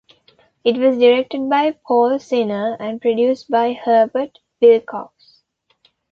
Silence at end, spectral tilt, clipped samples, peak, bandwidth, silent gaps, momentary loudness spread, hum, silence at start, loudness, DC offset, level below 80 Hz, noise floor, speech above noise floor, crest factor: 1.05 s; -6 dB/octave; under 0.1%; -2 dBFS; 6.8 kHz; none; 10 LU; none; 0.65 s; -17 LUFS; under 0.1%; -66 dBFS; -62 dBFS; 46 dB; 16 dB